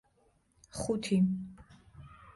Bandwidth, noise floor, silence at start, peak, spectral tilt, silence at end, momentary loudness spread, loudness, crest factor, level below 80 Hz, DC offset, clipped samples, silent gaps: 11.5 kHz; -70 dBFS; 0.75 s; -20 dBFS; -6.5 dB/octave; 0.05 s; 23 LU; -32 LUFS; 16 dB; -60 dBFS; under 0.1%; under 0.1%; none